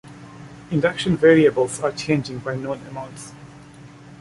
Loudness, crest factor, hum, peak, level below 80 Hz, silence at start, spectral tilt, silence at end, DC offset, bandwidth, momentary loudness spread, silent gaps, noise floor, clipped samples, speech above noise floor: -20 LUFS; 20 dB; none; -2 dBFS; -54 dBFS; 0.05 s; -6 dB/octave; 0.05 s; under 0.1%; 11.5 kHz; 26 LU; none; -43 dBFS; under 0.1%; 23 dB